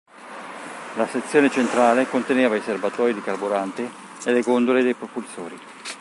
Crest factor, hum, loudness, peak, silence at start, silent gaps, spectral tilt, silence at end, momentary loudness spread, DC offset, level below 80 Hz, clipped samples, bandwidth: 20 dB; none; -21 LUFS; -2 dBFS; 0.15 s; none; -4.5 dB/octave; 0 s; 17 LU; under 0.1%; -76 dBFS; under 0.1%; 11.5 kHz